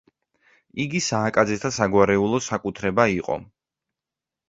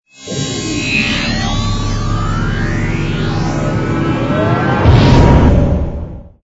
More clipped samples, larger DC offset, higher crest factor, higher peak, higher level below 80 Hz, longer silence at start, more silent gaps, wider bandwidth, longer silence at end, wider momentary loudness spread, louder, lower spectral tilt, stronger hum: second, under 0.1% vs 0.2%; neither; first, 22 dB vs 12 dB; about the same, -2 dBFS vs 0 dBFS; second, -52 dBFS vs -20 dBFS; first, 0.75 s vs 0.2 s; neither; about the same, 8 kHz vs 8 kHz; first, 1.05 s vs 0.15 s; about the same, 11 LU vs 10 LU; second, -22 LUFS vs -14 LUFS; about the same, -5 dB/octave vs -6 dB/octave; neither